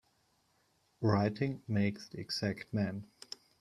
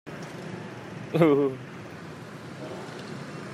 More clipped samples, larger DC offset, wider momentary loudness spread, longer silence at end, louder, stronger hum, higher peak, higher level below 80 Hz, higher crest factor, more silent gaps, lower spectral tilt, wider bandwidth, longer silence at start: neither; neither; second, 16 LU vs 19 LU; first, 0.55 s vs 0 s; second, -35 LUFS vs -29 LUFS; neither; second, -14 dBFS vs -6 dBFS; about the same, -68 dBFS vs -70 dBFS; about the same, 22 dB vs 22 dB; neither; about the same, -6.5 dB/octave vs -7 dB/octave; second, 12.5 kHz vs 14 kHz; first, 1 s vs 0.05 s